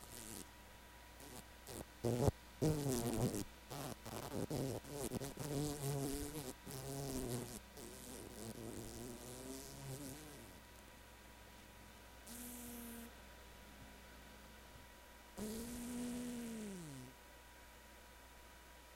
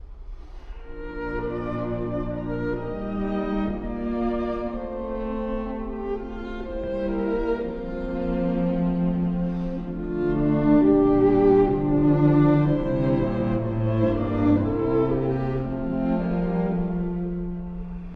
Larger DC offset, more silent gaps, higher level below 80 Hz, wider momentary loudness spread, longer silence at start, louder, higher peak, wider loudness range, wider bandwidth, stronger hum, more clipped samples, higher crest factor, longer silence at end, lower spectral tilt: neither; neither; second, -60 dBFS vs -36 dBFS; first, 19 LU vs 13 LU; about the same, 0 s vs 0 s; second, -46 LUFS vs -24 LUFS; second, -18 dBFS vs -8 dBFS; first, 12 LU vs 9 LU; first, 17 kHz vs 5 kHz; neither; neither; first, 28 dB vs 16 dB; about the same, 0 s vs 0 s; second, -5 dB/octave vs -11 dB/octave